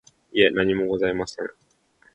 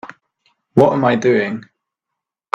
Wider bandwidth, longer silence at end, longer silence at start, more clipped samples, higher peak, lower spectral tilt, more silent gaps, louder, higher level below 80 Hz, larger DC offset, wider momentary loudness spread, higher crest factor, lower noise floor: about the same, 9 kHz vs 8.2 kHz; second, 0.65 s vs 0.95 s; first, 0.35 s vs 0.05 s; neither; second, -4 dBFS vs 0 dBFS; second, -5 dB/octave vs -7 dB/octave; neither; second, -22 LUFS vs -15 LUFS; about the same, -54 dBFS vs -58 dBFS; neither; first, 14 LU vs 10 LU; about the same, 20 dB vs 18 dB; second, -61 dBFS vs -82 dBFS